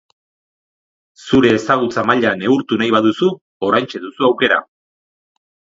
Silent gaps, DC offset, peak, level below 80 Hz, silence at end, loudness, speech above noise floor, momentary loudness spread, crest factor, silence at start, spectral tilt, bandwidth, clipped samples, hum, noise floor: 3.41-3.60 s; under 0.1%; 0 dBFS; -52 dBFS; 1.15 s; -15 LUFS; over 75 dB; 5 LU; 18 dB; 1.25 s; -5.5 dB/octave; 7.8 kHz; under 0.1%; none; under -90 dBFS